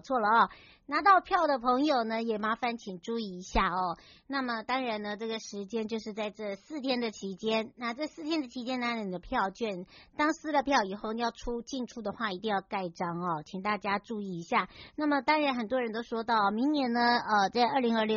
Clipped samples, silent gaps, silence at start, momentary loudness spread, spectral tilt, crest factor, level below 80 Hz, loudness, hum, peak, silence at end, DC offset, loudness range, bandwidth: under 0.1%; none; 0.05 s; 11 LU; -2.5 dB/octave; 20 dB; -54 dBFS; -31 LUFS; none; -10 dBFS; 0 s; under 0.1%; 6 LU; 7.2 kHz